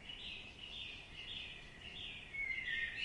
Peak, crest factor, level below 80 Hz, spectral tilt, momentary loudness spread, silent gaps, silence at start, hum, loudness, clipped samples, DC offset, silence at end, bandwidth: -30 dBFS; 16 dB; -62 dBFS; -2.5 dB/octave; 10 LU; none; 0 s; none; -44 LUFS; under 0.1%; under 0.1%; 0 s; 11 kHz